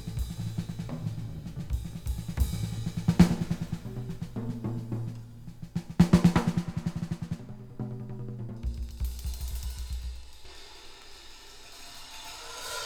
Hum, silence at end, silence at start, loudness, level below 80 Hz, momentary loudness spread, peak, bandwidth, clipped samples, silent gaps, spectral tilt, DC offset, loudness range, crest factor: none; 0 s; 0 s; -31 LUFS; -40 dBFS; 23 LU; -4 dBFS; 18 kHz; under 0.1%; none; -6.5 dB/octave; under 0.1%; 11 LU; 26 dB